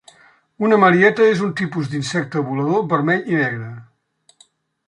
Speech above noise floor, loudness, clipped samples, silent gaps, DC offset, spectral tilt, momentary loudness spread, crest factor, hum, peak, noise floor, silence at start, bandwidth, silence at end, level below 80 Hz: 42 dB; -17 LUFS; under 0.1%; none; under 0.1%; -6.5 dB/octave; 10 LU; 16 dB; none; -2 dBFS; -59 dBFS; 0.6 s; 11 kHz; 1.05 s; -64 dBFS